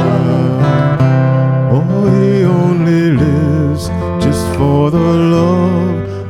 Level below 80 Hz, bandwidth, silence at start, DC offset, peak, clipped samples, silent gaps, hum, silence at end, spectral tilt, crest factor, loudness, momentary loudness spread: -34 dBFS; 12.5 kHz; 0 s; 0.2%; 0 dBFS; under 0.1%; none; none; 0 s; -8 dB/octave; 10 dB; -12 LUFS; 4 LU